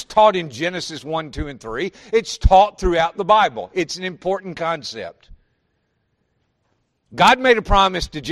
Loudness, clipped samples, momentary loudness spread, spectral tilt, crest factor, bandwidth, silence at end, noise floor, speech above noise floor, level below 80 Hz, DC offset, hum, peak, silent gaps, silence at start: -18 LUFS; under 0.1%; 14 LU; -4.5 dB/octave; 20 dB; 13 kHz; 0 s; -69 dBFS; 51 dB; -30 dBFS; under 0.1%; none; 0 dBFS; none; 0 s